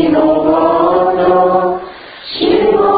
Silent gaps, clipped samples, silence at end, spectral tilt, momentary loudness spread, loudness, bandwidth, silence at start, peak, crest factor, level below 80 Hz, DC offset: none; under 0.1%; 0 s; -11.5 dB/octave; 13 LU; -11 LUFS; 5 kHz; 0 s; 0 dBFS; 12 dB; -44 dBFS; under 0.1%